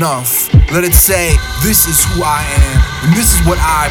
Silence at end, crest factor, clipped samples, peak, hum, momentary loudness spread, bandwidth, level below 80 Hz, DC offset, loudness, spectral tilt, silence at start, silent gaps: 0 s; 10 dB; 0.1%; 0 dBFS; none; 5 LU; over 20 kHz; -16 dBFS; under 0.1%; -10 LUFS; -4 dB/octave; 0 s; none